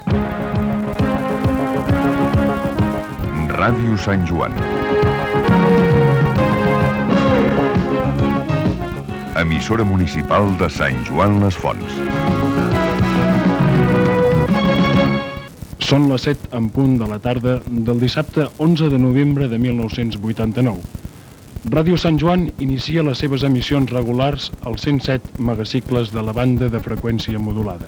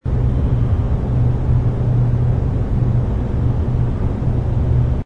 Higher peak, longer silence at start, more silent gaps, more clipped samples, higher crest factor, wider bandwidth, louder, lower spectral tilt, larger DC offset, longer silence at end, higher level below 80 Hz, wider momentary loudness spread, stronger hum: first, 0 dBFS vs -4 dBFS; about the same, 0 s vs 0.05 s; neither; neither; about the same, 16 dB vs 12 dB; first, 18.5 kHz vs 4 kHz; about the same, -17 LUFS vs -18 LUFS; second, -7.5 dB/octave vs -10.5 dB/octave; neither; about the same, 0 s vs 0 s; second, -34 dBFS vs -22 dBFS; first, 7 LU vs 3 LU; neither